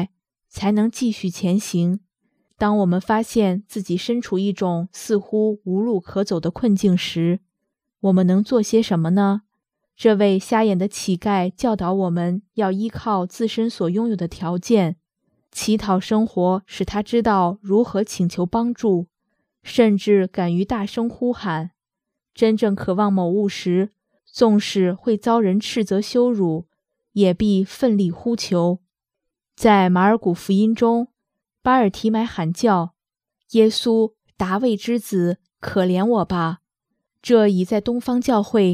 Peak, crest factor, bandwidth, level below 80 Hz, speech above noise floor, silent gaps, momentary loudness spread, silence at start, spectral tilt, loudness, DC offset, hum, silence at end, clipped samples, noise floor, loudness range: 0 dBFS; 18 dB; 14.5 kHz; -52 dBFS; 65 dB; none; 8 LU; 0 s; -6.5 dB/octave; -20 LUFS; under 0.1%; none; 0 s; under 0.1%; -84 dBFS; 3 LU